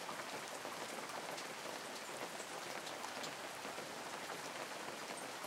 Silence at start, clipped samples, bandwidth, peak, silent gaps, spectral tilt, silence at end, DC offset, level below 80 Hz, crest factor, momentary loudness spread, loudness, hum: 0 s; under 0.1%; 16 kHz; -28 dBFS; none; -1.5 dB/octave; 0 s; under 0.1%; under -90 dBFS; 18 dB; 1 LU; -46 LUFS; none